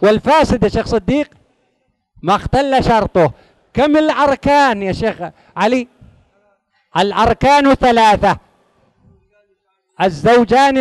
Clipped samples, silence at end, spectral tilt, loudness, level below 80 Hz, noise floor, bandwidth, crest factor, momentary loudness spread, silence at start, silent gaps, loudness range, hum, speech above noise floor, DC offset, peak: under 0.1%; 0 s; -5.5 dB/octave; -14 LUFS; -34 dBFS; -65 dBFS; 12 kHz; 14 dB; 11 LU; 0 s; none; 2 LU; none; 52 dB; under 0.1%; 0 dBFS